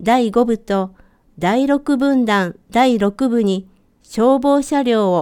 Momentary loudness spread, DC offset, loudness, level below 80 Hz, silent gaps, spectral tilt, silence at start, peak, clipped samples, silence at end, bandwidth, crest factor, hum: 7 LU; under 0.1%; -16 LUFS; -48 dBFS; none; -6 dB/octave; 0 s; -2 dBFS; under 0.1%; 0 s; 14.5 kHz; 14 dB; none